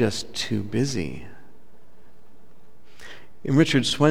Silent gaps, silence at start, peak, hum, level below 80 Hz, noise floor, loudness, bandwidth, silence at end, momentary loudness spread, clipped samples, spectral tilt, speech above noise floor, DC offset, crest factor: none; 0 s; -4 dBFS; none; -54 dBFS; -57 dBFS; -24 LUFS; 15.5 kHz; 0 s; 25 LU; under 0.1%; -5 dB/octave; 35 dB; 2%; 22 dB